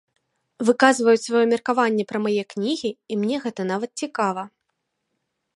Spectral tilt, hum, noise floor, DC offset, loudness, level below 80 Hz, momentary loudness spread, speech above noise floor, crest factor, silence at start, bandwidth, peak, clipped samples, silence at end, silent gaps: -4.5 dB/octave; none; -77 dBFS; under 0.1%; -22 LUFS; -74 dBFS; 10 LU; 55 dB; 22 dB; 0.6 s; 11.5 kHz; -2 dBFS; under 0.1%; 1.1 s; none